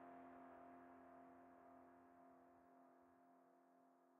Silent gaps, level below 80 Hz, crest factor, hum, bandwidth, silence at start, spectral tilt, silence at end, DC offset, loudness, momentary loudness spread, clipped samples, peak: none; under -90 dBFS; 14 dB; none; 3.3 kHz; 0 s; -1.5 dB/octave; 0 s; under 0.1%; -65 LUFS; 7 LU; under 0.1%; -52 dBFS